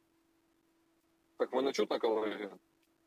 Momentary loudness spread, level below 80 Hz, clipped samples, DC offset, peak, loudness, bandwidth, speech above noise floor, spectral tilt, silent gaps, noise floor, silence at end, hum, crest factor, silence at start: 10 LU; -90 dBFS; under 0.1%; under 0.1%; -20 dBFS; -35 LUFS; 15.5 kHz; 39 dB; -4 dB/octave; none; -74 dBFS; 0.5 s; none; 18 dB; 1.4 s